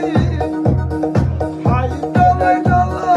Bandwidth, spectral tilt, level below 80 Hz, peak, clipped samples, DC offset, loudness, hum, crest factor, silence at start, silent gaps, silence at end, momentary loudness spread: 11 kHz; -8.5 dB/octave; -28 dBFS; -2 dBFS; under 0.1%; under 0.1%; -16 LUFS; none; 12 dB; 0 s; none; 0 s; 6 LU